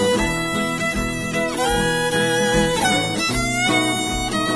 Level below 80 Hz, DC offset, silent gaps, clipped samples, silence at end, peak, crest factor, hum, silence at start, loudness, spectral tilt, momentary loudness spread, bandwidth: -36 dBFS; 0.3%; none; under 0.1%; 0 s; -6 dBFS; 14 dB; none; 0 s; -19 LUFS; -3.5 dB/octave; 4 LU; 11 kHz